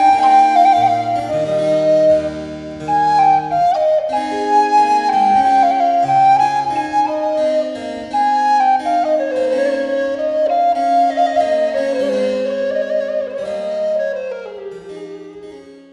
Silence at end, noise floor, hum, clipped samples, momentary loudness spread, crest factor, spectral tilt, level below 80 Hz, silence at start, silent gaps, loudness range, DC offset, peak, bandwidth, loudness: 0.15 s; -36 dBFS; none; under 0.1%; 14 LU; 14 dB; -5 dB/octave; -54 dBFS; 0 s; none; 6 LU; under 0.1%; -2 dBFS; 11.5 kHz; -15 LUFS